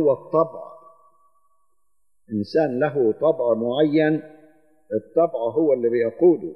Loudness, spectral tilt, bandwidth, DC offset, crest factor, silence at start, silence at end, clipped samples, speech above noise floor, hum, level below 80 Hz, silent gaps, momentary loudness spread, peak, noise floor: -21 LUFS; -9 dB/octave; 6 kHz; 0.1%; 16 dB; 0 s; 0 s; under 0.1%; 57 dB; none; -74 dBFS; none; 11 LU; -6 dBFS; -78 dBFS